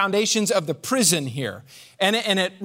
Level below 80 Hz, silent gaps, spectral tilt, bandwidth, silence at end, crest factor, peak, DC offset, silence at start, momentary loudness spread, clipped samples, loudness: -70 dBFS; none; -3 dB/octave; 16 kHz; 0 s; 18 dB; -4 dBFS; under 0.1%; 0 s; 11 LU; under 0.1%; -21 LUFS